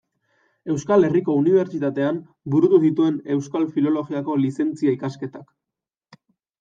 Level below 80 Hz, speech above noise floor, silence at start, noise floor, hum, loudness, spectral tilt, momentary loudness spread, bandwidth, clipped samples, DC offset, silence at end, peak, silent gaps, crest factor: -66 dBFS; 67 dB; 0.65 s; -87 dBFS; none; -21 LUFS; -8 dB/octave; 11 LU; 7.8 kHz; under 0.1%; under 0.1%; 1.15 s; -6 dBFS; none; 16 dB